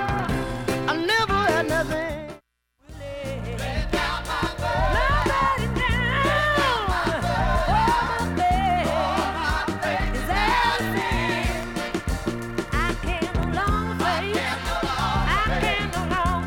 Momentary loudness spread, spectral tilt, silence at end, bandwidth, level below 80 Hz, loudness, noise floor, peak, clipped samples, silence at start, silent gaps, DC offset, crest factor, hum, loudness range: 8 LU; -5 dB/octave; 0 s; 17.5 kHz; -32 dBFS; -23 LUFS; -61 dBFS; -8 dBFS; under 0.1%; 0 s; none; under 0.1%; 16 dB; none; 4 LU